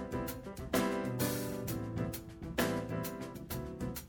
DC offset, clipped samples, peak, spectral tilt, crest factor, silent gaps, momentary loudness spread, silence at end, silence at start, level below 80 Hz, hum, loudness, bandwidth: under 0.1%; under 0.1%; -18 dBFS; -5 dB/octave; 20 dB; none; 8 LU; 0 s; 0 s; -52 dBFS; none; -38 LUFS; 17.5 kHz